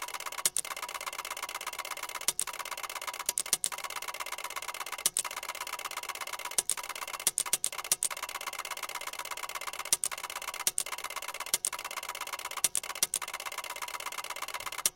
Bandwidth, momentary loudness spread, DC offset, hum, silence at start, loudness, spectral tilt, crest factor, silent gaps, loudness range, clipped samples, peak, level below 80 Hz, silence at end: 17 kHz; 8 LU; under 0.1%; none; 0 s; -33 LUFS; 2 dB/octave; 30 dB; none; 2 LU; under 0.1%; -6 dBFS; -70 dBFS; 0 s